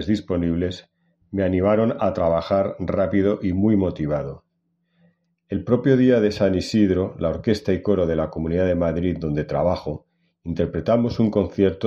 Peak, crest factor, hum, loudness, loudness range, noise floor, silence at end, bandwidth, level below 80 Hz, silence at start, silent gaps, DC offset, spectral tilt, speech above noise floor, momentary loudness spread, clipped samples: -4 dBFS; 18 dB; none; -21 LUFS; 3 LU; -71 dBFS; 0 s; 8.8 kHz; -44 dBFS; 0 s; none; under 0.1%; -8 dB/octave; 50 dB; 9 LU; under 0.1%